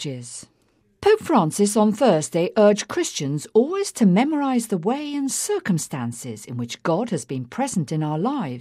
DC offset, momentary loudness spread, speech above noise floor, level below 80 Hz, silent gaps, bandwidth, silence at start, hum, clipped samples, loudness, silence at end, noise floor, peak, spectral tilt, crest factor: under 0.1%; 13 LU; 42 dB; -64 dBFS; none; 15.5 kHz; 0 s; none; under 0.1%; -21 LUFS; 0 s; -63 dBFS; -4 dBFS; -5.5 dB/octave; 16 dB